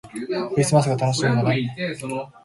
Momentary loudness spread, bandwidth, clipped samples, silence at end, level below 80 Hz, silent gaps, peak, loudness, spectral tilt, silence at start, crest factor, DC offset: 10 LU; 11.5 kHz; under 0.1%; 0.15 s; -56 dBFS; none; -4 dBFS; -22 LUFS; -5.5 dB/octave; 0.05 s; 18 dB; under 0.1%